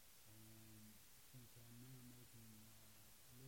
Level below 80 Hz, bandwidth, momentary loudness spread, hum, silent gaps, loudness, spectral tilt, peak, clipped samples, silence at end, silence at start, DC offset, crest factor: -80 dBFS; 16.5 kHz; 3 LU; none; none; -63 LUFS; -4 dB/octave; -50 dBFS; under 0.1%; 0 s; 0 s; under 0.1%; 14 dB